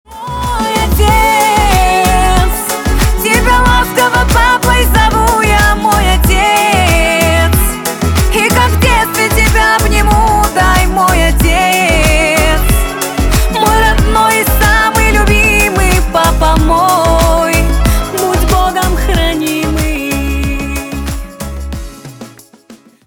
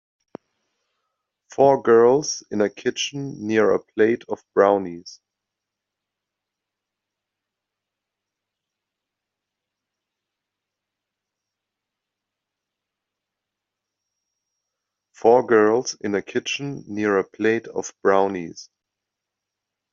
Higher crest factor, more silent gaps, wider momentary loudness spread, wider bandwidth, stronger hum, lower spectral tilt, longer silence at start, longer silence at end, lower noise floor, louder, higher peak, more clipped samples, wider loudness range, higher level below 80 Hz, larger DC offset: second, 10 dB vs 22 dB; neither; second, 7 LU vs 14 LU; first, 20 kHz vs 7.4 kHz; neither; about the same, -4 dB/octave vs -3.5 dB/octave; second, 0.1 s vs 1.6 s; second, 0.3 s vs 1.3 s; second, -39 dBFS vs -84 dBFS; first, -10 LUFS vs -20 LUFS; about the same, 0 dBFS vs -2 dBFS; neither; about the same, 4 LU vs 6 LU; first, -14 dBFS vs -70 dBFS; neither